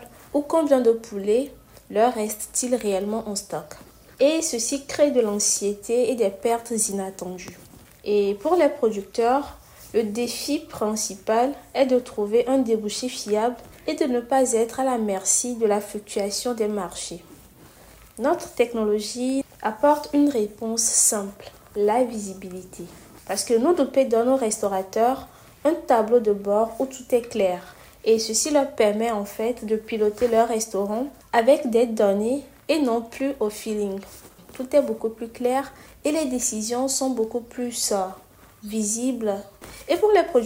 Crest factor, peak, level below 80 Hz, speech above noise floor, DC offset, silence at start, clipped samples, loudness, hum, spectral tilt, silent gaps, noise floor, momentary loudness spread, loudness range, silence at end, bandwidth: 18 dB; -6 dBFS; -56 dBFS; 26 dB; under 0.1%; 0 s; under 0.1%; -23 LUFS; none; -3.5 dB/octave; none; -49 dBFS; 12 LU; 4 LU; 0 s; 16 kHz